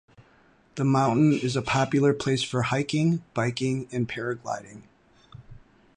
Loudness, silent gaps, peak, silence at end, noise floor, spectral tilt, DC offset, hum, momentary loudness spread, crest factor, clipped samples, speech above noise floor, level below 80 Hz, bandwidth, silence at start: -25 LUFS; none; -10 dBFS; 0.4 s; -59 dBFS; -6 dB/octave; under 0.1%; none; 9 LU; 16 dB; under 0.1%; 35 dB; -58 dBFS; 11 kHz; 0.75 s